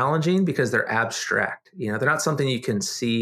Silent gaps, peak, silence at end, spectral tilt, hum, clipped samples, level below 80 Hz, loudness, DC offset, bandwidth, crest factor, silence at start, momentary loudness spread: none; -6 dBFS; 0 s; -4.5 dB/octave; none; under 0.1%; -68 dBFS; -23 LUFS; under 0.1%; 15.5 kHz; 16 dB; 0 s; 5 LU